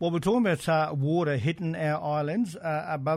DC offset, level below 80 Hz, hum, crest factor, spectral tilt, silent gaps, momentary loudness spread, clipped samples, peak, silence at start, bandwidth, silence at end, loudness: under 0.1%; -60 dBFS; none; 14 dB; -7 dB/octave; none; 5 LU; under 0.1%; -14 dBFS; 0 s; 14.5 kHz; 0 s; -27 LUFS